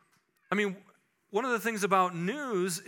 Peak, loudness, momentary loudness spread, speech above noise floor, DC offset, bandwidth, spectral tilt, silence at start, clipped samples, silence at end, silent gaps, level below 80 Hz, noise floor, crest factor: -10 dBFS; -30 LUFS; 7 LU; 40 dB; under 0.1%; 18 kHz; -4.5 dB/octave; 0.5 s; under 0.1%; 0 s; none; under -90 dBFS; -70 dBFS; 22 dB